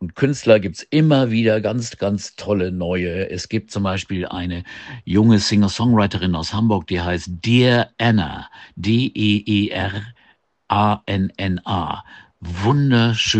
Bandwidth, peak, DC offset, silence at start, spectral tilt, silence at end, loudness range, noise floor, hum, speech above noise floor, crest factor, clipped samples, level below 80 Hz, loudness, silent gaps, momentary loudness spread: 8.6 kHz; 0 dBFS; under 0.1%; 0 s; -6 dB/octave; 0 s; 5 LU; -57 dBFS; none; 39 dB; 18 dB; under 0.1%; -46 dBFS; -19 LUFS; none; 12 LU